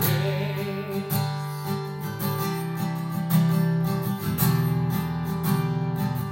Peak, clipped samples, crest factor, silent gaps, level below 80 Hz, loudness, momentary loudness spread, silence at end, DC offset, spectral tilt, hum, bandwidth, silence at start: -10 dBFS; under 0.1%; 16 dB; none; -56 dBFS; -26 LUFS; 7 LU; 0 s; under 0.1%; -6.5 dB/octave; none; 16.5 kHz; 0 s